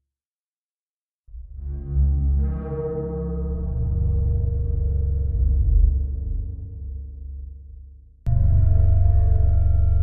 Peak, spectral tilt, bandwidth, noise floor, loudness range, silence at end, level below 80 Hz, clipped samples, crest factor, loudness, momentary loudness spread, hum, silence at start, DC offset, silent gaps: -6 dBFS; -13.5 dB/octave; 1.8 kHz; under -90 dBFS; 4 LU; 0 s; -22 dBFS; under 0.1%; 14 dB; -23 LUFS; 18 LU; none; 1.35 s; under 0.1%; none